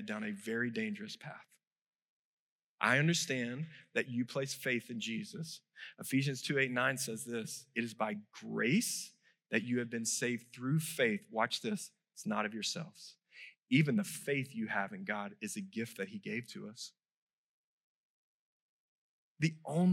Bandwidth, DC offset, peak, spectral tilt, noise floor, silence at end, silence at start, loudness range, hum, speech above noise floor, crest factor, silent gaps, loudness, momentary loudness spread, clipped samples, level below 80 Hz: 16 kHz; under 0.1%; -14 dBFS; -4.5 dB/octave; -57 dBFS; 0 s; 0 s; 8 LU; none; 21 dB; 24 dB; 1.67-2.78 s, 17.11-17.27 s, 17.33-19.35 s; -36 LUFS; 15 LU; under 0.1%; under -90 dBFS